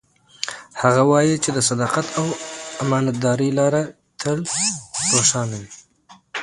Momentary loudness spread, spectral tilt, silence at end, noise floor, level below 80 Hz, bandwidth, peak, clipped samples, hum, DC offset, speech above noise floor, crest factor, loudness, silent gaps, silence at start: 14 LU; -4 dB/octave; 0 s; -51 dBFS; -58 dBFS; 11.5 kHz; 0 dBFS; under 0.1%; none; under 0.1%; 32 dB; 20 dB; -20 LUFS; none; 0.4 s